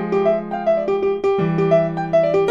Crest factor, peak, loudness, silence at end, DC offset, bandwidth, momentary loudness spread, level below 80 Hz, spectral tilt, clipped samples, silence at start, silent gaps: 14 dB; -4 dBFS; -18 LUFS; 0 s; under 0.1%; 7.2 kHz; 3 LU; -50 dBFS; -8.5 dB/octave; under 0.1%; 0 s; none